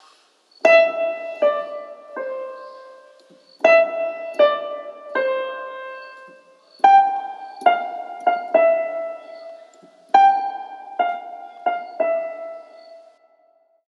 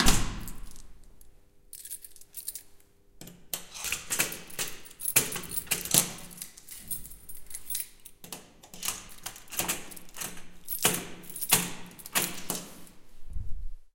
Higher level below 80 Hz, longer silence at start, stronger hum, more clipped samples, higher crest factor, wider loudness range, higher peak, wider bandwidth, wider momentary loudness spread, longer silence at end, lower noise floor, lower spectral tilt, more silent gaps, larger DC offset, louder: second, -86 dBFS vs -42 dBFS; first, 0.65 s vs 0 s; neither; neither; second, 20 dB vs 32 dB; second, 3 LU vs 9 LU; about the same, -2 dBFS vs 0 dBFS; second, 7.2 kHz vs 17 kHz; about the same, 21 LU vs 22 LU; first, 0.9 s vs 0.05 s; first, -60 dBFS vs -55 dBFS; about the same, -2.5 dB/octave vs -1.5 dB/octave; neither; neither; first, -19 LUFS vs -30 LUFS